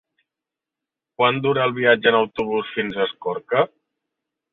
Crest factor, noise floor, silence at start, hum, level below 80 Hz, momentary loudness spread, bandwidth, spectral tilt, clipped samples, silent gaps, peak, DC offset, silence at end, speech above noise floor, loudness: 20 dB; -87 dBFS; 1.2 s; none; -62 dBFS; 8 LU; 4.2 kHz; -7.5 dB/octave; under 0.1%; none; -2 dBFS; under 0.1%; 0.85 s; 67 dB; -20 LUFS